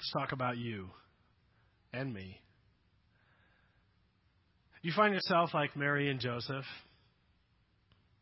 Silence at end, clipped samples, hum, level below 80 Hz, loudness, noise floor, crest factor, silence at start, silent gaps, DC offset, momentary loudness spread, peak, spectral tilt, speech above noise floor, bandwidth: 1.4 s; under 0.1%; none; -70 dBFS; -34 LUFS; -73 dBFS; 24 dB; 0 s; none; under 0.1%; 18 LU; -14 dBFS; -3.5 dB/octave; 38 dB; 5.8 kHz